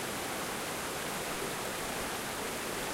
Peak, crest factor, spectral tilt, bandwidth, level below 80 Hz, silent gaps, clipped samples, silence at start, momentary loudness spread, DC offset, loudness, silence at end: -24 dBFS; 12 dB; -2.5 dB/octave; 16 kHz; -58 dBFS; none; under 0.1%; 0 s; 0 LU; under 0.1%; -36 LUFS; 0 s